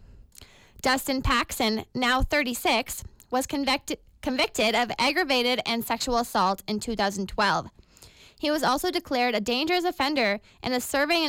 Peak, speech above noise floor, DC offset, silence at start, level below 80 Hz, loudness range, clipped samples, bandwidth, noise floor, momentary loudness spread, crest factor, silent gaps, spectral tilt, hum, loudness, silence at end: -14 dBFS; 27 dB; under 0.1%; 0 s; -44 dBFS; 2 LU; under 0.1%; 17 kHz; -52 dBFS; 7 LU; 14 dB; none; -3 dB/octave; none; -25 LUFS; 0 s